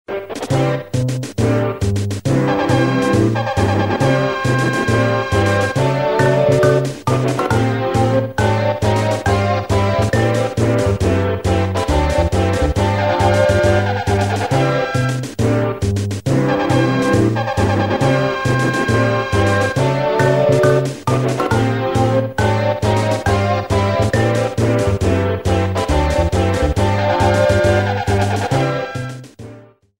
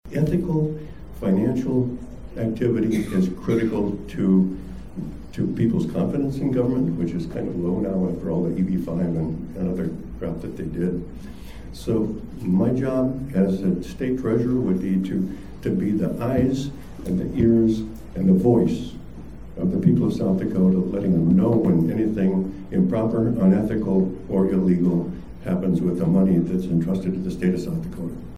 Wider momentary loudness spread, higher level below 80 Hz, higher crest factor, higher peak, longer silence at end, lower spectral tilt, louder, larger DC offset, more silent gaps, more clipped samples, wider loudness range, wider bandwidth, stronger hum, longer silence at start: second, 4 LU vs 13 LU; first, -30 dBFS vs -42 dBFS; about the same, 14 dB vs 16 dB; first, -2 dBFS vs -6 dBFS; first, 0.35 s vs 0 s; second, -6.5 dB/octave vs -9 dB/octave; first, -16 LUFS vs -22 LUFS; second, 0.3% vs 0.8%; neither; neither; second, 1 LU vs 5 LU; first, 16 kHz vs 12 kHz; neither; about the same, 0.1 s vs 0 s